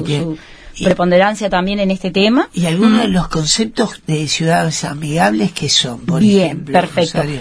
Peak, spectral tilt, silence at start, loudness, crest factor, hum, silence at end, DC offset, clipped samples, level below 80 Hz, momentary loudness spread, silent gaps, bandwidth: 0 dBFS; -4.5 dB/octave; 0 s; -14 LUFS; 14 dB; none; 0 s; under 0.1%; under 0.1%; -38 dBFS; 8 LU; none; 11 kHz